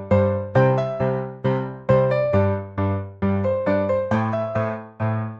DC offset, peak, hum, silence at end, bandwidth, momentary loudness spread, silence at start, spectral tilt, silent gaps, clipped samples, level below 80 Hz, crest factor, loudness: 0.1%; -4 dBFS; none; 0 s; 7 kHz; 7 LU; 0 s; -9.5 dB/octave; none; under 0.1%; -52 dBFS; 16 dB; -22 LUFS